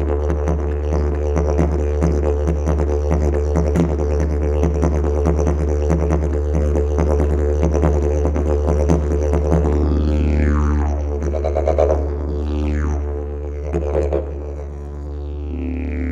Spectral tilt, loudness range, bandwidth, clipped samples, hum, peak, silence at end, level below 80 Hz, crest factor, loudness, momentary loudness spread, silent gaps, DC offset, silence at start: -8.5 dB/octave; 4 LU; 7.4 kHz; under 0.1%; none; -2 dBFS; 0 s; -20 dBFS; 16 dB; -19 LUFS; 8 LU; none; under 0.1%; 0 s